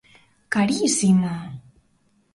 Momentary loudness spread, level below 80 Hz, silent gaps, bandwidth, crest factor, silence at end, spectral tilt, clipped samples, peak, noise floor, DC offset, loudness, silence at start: 19 LU; -58 dBFS; none; 11.5 kHz; 16 dB; 0.75 s; -4.5 dB/octave; under 0.1%; -8 dBFS; -63 dBFS; under 0.1%; -20 LUFS; 0.5 s